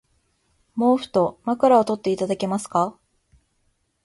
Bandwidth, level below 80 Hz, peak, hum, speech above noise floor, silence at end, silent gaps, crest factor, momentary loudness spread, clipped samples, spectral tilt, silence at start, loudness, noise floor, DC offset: 11.5 kHz; -62 dBFS; -4 dBFS; none; 48 dB; 1.15 s; none; 18 dB; 8 LU; under 0.1%; -6 dB/octave; 0.75 s; -21 LUFS; -69 dBFS; under 0.1%